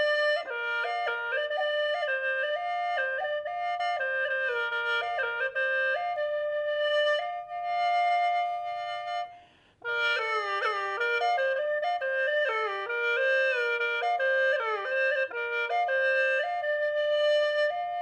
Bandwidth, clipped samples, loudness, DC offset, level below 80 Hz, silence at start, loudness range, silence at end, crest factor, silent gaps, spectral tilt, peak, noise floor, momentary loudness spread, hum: 9.4 kHz; under 0.1%; -28 LUFS; under 0.1%; -74 dBFS; 0 s; 3 LU; 0 s; 12 dB; none; -1 dB/octave; -16 dBFS; -56 dBFS; 6 LU; none